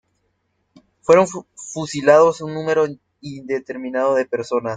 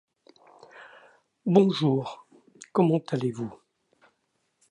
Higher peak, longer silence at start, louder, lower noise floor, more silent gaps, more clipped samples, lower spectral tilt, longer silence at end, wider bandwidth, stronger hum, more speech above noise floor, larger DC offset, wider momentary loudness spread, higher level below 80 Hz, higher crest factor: first, -2 dBFS vs -6 dBFS; first, 1.1 s vs 0.75 s; first, -18 LUFS vs -25 LUFS; second, -69 dBFS vs -75 dBFS; neither; neither; second, -5 dB/octave vs -7.5 dB/octave; second, 0 s vs 1.15 s; about the same, 9.4 kHz vs 10 kHz; neither; about the same, 51 dB vs 51 dB; neither; about the same, 18 LU vs 18 LU; first, -62 dBFS vs -74 dBFS; about the same, 18 dB vs 22 dB